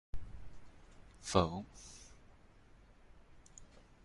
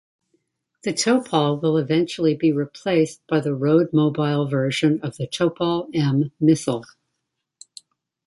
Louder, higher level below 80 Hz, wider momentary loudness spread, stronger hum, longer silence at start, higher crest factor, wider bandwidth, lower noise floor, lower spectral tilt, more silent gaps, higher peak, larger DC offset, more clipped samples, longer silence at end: second, -37 LUFS vs -21 LUFS; first, -56 dBFS vs -62 dBFS; first, 29 LU vs 6 LU; neither; second, 0.15 s vs 0.85 s; first, 28 dB vs 18 dB; about the same, 11.5 kHz vs 11.5 kHz; second, -62 dBFS vs -79 dBFS; about the same, -5 dB/octave vs -6 dB/octave; neither; second, -14 dBFS vs -4 dBFS; neither; neither; second, 0.25 s vs 1.45 s